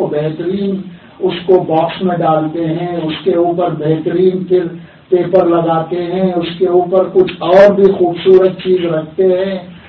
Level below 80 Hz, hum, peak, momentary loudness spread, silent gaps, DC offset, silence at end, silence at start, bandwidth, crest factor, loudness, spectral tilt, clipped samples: -50 dBFS; none; 0 dBFS; 9 LU; none; under 0.1%; 0.1 s; 0 s; 5.6 kHz; 12 dB; -13 LUFS; -9 dB/octave; 0.3%